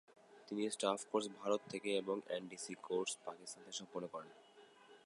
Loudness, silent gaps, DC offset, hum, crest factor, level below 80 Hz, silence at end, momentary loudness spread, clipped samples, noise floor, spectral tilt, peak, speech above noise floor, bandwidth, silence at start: -42 LUFS; none; under 0.1%; none; 22 dB; under -90 dBFS; 0.1 s; 13 LU; under 0.1%; -63 dBFS; -3 dB/octave; -20 dBFS; 21 dB; 11.5 kHz; 0.1 s